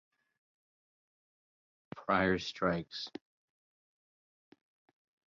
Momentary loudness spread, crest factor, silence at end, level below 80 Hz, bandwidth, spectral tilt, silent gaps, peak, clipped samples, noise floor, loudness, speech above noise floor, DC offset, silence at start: 19 LU; 24 dB; 2.2 s; -64 dBFS; 7.2 kHz; -3.5 dB/octave; none; -16 dBFS; under 0.1%; under -90 dBFS; -34 LUFS; over 57 dB; under 0.1%; 1.95 s